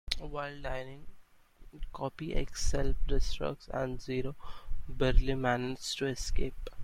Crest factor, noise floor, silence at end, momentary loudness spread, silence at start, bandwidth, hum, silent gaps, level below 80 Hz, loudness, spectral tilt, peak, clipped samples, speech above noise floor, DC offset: 22 dB; -55 dBFS; 0 s; 16 LU; 0.05 s; 12 kHz; none; none; -36 dBFS; -35 LUFS; -4.5 dB/octave; -8 dBFS; under 0.1%; 24 dB; under 0.1%